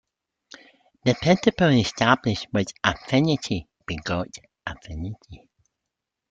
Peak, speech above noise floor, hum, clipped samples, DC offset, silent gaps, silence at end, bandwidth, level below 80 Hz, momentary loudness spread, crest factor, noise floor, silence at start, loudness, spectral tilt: -2 dBFS; 61 dB; none; under 0.1%; under 0.1%; none; 0.95 s; 9.2 kHz; -50 dBFS; 16 LU; 22 dB; -84 dBFS; 1.05 s; -23 LUFS; -5.5 dB/octave